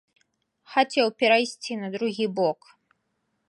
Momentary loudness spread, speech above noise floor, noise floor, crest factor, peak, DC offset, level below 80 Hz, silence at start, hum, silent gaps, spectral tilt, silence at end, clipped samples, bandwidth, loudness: 11 LU; 51 dB; -75 dBFS; 20 dB; -6 dBFS; under 0.1%; -82 dBFS; 0.7 s; none; none; -4 dB/octave; 0.95 s; under 0.1%; 11.5 kHz; -24 LUFS